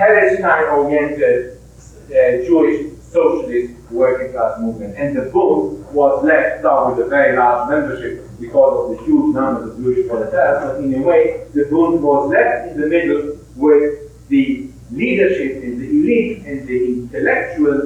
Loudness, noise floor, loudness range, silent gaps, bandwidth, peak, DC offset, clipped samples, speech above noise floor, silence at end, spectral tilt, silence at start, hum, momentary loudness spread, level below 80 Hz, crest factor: -16 LUFS; -40 dBFS; 2 LU; none; 9.8 kHz; 0 dBFS; under 0.1%; under 0.1%; 25 dB; 0 s; -7.5 dB/octave; 0 s; none; 9 LU; -44 dBFS; 16 dB